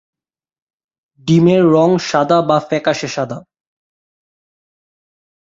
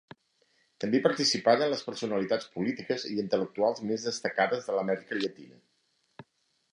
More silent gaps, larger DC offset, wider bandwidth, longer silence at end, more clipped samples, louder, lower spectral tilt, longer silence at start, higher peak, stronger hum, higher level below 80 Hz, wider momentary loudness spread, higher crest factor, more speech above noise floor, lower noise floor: neither; neither; second, 7.8 kHz vs 11 kHz; first, 2.05 s vs 0.5 s; neither; first, -14 LUFS vs -29 LUFS; first, -6.5 dB/octave vs -4 dB/octave; first, 1.25 s vs 0.8 s; first, -2 dBFS vs -8 dBFS; neither; first, -58 dBFS vs -76 dBFS; first, 13 LU vs 8 LU; second, 16 dB vs 22 dB; first, over 77 dB vs 43 dB; first, under -90 dBFS vs -72 dBFS